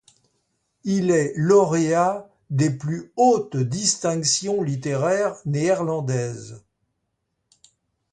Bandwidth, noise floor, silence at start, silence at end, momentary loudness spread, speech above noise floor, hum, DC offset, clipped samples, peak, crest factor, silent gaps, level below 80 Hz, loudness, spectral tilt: 11 kHz; -76 dBFS; 0.85 s; 1.55 s; 11 LU; 55 dB; none; under 0.1%; under 0.1%; -4 dBFS; 18 dB; none; -62 dBFS; -21 LUFS; -5 dB/octave